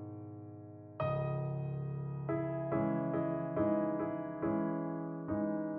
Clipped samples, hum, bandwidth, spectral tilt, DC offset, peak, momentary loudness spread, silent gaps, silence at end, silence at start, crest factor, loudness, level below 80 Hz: under 0.1%; none; 4.1 kHz; -9.5 dB/octave; under 0.1%; -22 dBFS; 14 LU; none; 0 s; 0 s; 16 dB; -37 LUFS; -66 dBFS